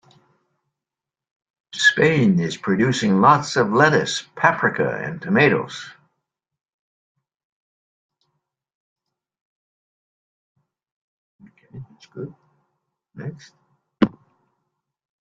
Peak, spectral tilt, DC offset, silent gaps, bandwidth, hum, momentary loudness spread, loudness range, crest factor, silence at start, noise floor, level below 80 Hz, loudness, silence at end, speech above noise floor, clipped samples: -2 dBFS; -5 dB/octave; under 0.1%; 6.74-7.15 s, 7.45-8.09 s, 8.75-8.96 s, 9.41-10.55 s, 10.92-11.39 s; 9.4 kHz; none; 20 LU; 23 LU; 22 dB; 1.75 s; -88 dBFS; -62 dBFS; -18 LUFS; 1.1 s; 70 dB; under 0.1%